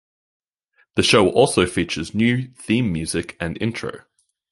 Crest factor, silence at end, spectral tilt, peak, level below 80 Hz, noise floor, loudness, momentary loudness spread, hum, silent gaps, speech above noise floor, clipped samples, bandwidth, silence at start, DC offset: 20 dB; 0.55 s; -4.5 dB/octave; -2 dBFS; -44 dBFS; -64 dBFS; -20 LUFS; 11 LU; none; none; 44 dB; under 0.1%; 11.5 kHz; 0.95 s; under 0.1%